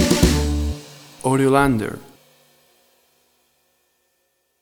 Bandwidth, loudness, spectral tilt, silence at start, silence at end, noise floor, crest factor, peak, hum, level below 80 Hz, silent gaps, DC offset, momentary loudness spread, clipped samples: over 20 kHz; -19 LUFS; -5.5 dB/octave; 0 s; 2.6 s; -68 dBFS; 20 dB; -2 dBFS; none; -30 dBFS; none; under 0.1%; 19 LU; under 0.1%